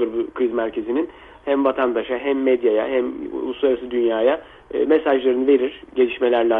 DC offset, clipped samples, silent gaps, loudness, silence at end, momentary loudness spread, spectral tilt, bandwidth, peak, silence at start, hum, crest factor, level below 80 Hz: under 0.1%; under 0.1%; none; -20 LUFS; 0 s; 9 LU; -7.5 dB/octave; 3.9 kHz; -6 dBFS; 0 s; none; 14 dB; -54 dBFS